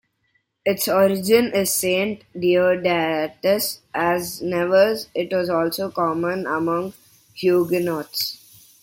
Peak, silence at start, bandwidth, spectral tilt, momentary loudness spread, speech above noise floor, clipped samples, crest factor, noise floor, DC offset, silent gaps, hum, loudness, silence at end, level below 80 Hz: -4 dBFS; 0.65 s; 17 kHz; -4 dB/octave; 8 LU; 48 dB; under 0.1%; 18 dB; -68 dBFS; under 0.1%; none; none; -21 LUFS; 0.45 s; -60 dBFS